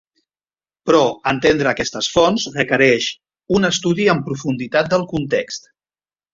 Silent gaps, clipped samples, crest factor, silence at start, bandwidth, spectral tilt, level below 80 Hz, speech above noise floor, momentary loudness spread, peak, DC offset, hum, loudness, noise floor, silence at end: none; under 0.1%; 18 dB; 0.85 s; 7.8 kHz; -4.5 dB/octave; -48 dBFS; over 73 dB; 8 LU; -2 dBFS; under 0.1%; none; -17 LUFS; under -90 dBFS; 0.75 s